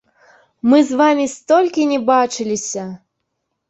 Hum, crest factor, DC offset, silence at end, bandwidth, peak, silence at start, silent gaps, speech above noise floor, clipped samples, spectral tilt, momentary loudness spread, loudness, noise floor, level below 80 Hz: none; 16 dB; under 0.1%; 0.75 s; 8.2 kHz; -2 dBFS; 0.65 s; none; 59 dB; under 0.1%; -4 dB/octave; 10 LU; -16 LUFS; -74 dBFS; -62 dBFS